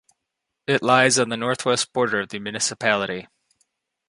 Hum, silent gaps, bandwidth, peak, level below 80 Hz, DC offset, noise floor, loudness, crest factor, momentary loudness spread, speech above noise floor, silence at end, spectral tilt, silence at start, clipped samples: none; none; 11.5 kHz; -2 dBFS; -64 dBFS; under 0.1%; -81 dBFS; -21 LUFS; 22 dB; 13 LU; 60 dB; 0.85 s; -3 dB/octave; 0.7 s; under 0.1%